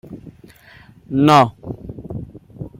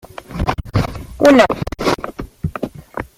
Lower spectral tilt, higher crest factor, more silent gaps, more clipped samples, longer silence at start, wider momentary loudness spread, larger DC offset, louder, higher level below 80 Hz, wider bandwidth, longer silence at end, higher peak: about the same, -6.5 dB/octave vs -6 dB/octave; about the same, 20 dB vs 16 dB; neither; neither; second, 0.1 s vs 0.3 s; first, 26 LU vs 18 LU; neither; about the same, -15 LUFS vs -17 LUFS; second, -48 dBFS vs -32 dBFS; about the same, 16 kHz vs 16 kHz; about the same, 0.1 s vs 0.15 s; about the same, 0 dBFS vs 0 dBFS